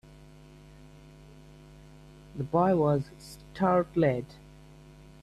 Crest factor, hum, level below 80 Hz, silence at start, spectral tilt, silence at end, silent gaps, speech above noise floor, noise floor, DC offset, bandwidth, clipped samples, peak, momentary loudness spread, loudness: 18 dB; none; -56 dBFS; 2.35 s; -8.5 dB/octave; 0.9 s; none; 25 dB; -52 dBFS; under 0.1%; 13.5 kHz; under 0.1%; -12 dBFS; 22 LU; -27 LUFS